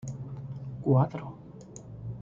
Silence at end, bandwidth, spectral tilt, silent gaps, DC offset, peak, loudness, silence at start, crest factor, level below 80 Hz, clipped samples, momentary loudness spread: 0 s; 7.6 kHz; -9 dB/octave; none; under 0.1%; -10 dBFS; -30 LUFS; 0 s; 20 dB; -58 dBFS; under 0.1%; 21 LU